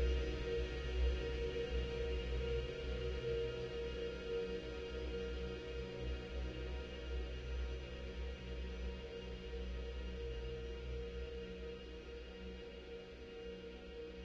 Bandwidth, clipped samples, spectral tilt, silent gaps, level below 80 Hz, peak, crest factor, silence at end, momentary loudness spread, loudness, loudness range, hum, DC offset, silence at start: 7.4 kHz; under 0.1%; -6.5 dB/octave; none; -46 dBFS; -28 dBFS; 16 dB; 0 s; 10 LU; -45 LUFS; 7 LU; none; under 0.1%; 0 s